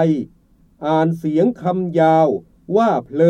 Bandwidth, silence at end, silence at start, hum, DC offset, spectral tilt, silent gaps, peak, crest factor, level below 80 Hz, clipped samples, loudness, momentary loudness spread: 9 kHz; 0 s; 0 s; none; under 0.1%; -8.5 dB/octave; none; -2 dBFS; 14 dB; -56 dBFS; under 0.1%; -18 LUFS; 11 LU